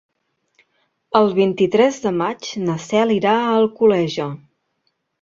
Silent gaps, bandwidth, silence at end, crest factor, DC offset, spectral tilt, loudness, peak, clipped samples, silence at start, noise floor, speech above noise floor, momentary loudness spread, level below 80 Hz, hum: none; 7.8 kHz; 0.85 s; 18 dB; under 0.1%; -6 dB/octave; -18 LUFS; -2 dBFS; under 0.1%; 1.1 s; -70 dBFS; 53 dB; 8 LU; -60 dBFS; none